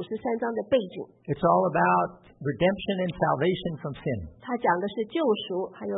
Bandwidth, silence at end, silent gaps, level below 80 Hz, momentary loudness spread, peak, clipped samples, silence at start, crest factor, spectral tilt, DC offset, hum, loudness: 4 kHz; 0 s; none; -56 dBFS; 11 LU; -8 dBFS; under 0.1%; 0 s; 18 dB; -10.5 dB/octave; under 0.1%; none; -27 LUFS